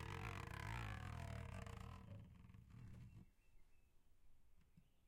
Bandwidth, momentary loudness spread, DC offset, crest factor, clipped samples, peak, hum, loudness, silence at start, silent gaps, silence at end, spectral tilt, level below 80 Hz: 16 kHz; 13 LU; under 0.1%; 18 dB; under 0.1%; -36 dBFS; none; -54 LUFS; 0 s; none; 0 s; -5.5 dB/octave; -62 dBFS